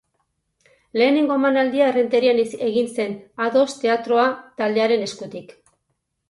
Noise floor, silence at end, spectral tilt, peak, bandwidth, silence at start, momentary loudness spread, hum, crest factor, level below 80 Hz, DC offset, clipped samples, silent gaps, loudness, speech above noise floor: -74 dBFS; 0.85 s; -4.5 dB/octave; -6 dBFS; 11.5 kHz; 0.95 s; 10 LU; none; 16 dB; -68 dBFS; under 0.1%; under 0.1%; none; -20 LUFS; 55 dB